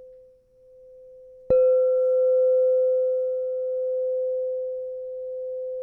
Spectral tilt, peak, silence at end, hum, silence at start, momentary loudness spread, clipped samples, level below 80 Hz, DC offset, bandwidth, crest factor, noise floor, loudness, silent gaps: -9.5 dB/octave; -10 dBFS; 0 s; none; 0 s; 13 LU; under 0.1%; -60 dBFS; under 0.1%; 2.7 kHz; 14 dB; -54 dBFS; -23 LUFS; none